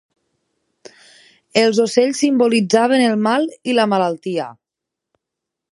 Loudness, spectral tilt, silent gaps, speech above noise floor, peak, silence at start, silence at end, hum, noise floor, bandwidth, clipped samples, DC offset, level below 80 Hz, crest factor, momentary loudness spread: -16 LUFS; -4.5 dB/octave; none; 68 dB; 0 dBFS; 1.55 s; 1.2 s; none; -83 dBFS; 11.5 kHz; under 0.1%; under 0.1%; -70 dBFS; 18 dB; 9 LU